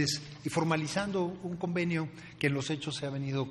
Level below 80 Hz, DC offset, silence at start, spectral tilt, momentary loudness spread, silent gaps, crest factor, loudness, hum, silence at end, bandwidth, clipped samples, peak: -64 dBFS; under 0.1%; 0 s; -5 dB/octave; 5 LU; none; 20 dB; -33 LUFS; none; 0 s; 13 kHz; under 0.1%; -14 dBFS